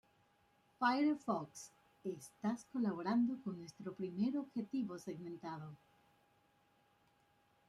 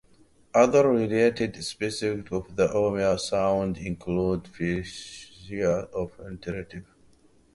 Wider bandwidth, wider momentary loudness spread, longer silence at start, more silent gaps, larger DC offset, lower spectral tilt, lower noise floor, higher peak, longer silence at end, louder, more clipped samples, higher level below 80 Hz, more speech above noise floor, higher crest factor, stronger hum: first, 13 kHz vs 11.5 kHz; second, 14 LU vs 17 LU; first, 0.8 s vs 0.55 s; neither; neither; about the same, -6 dB/octave vs -5.5 dB/octave; first, -75 dBFS vs -58 dBFS; second, -22 dBFS vs -6 dBFS; first, 1.9 s vs 0.75 s; second, -41 LUFS vs -26 LUFS; neither; second, -84 dBFS vs -50 dBFS; about the same, 35 dB vs 33 dB; about the same, 20 dB vs 20 dB; neither